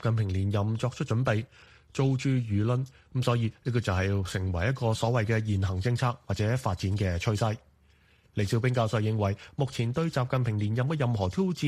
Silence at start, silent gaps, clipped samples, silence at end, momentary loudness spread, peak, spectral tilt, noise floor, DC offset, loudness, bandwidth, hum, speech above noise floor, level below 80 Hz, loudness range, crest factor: 0 s; none; under 0.1%; 0 s; 4 LU; -12 dBFS; -7 dB/octave; -62 dBFS; under 0.1%; -29 LUFS; 12.5 kHz; none; 34 dB; -52 dBFS; 1 LU; 16 dB